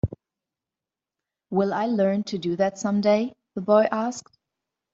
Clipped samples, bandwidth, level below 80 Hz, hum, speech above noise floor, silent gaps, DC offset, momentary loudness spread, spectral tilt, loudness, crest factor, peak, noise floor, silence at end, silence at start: under 0.1%; 7.8 kHz; -52 dBFS; none; 67 dB; none; under 0.1%; 11 LU; -6 dB/octave; -24 LUFS; 20 dB; -6 dBFS; -89 dBFS; 0.75 s; 0.05 s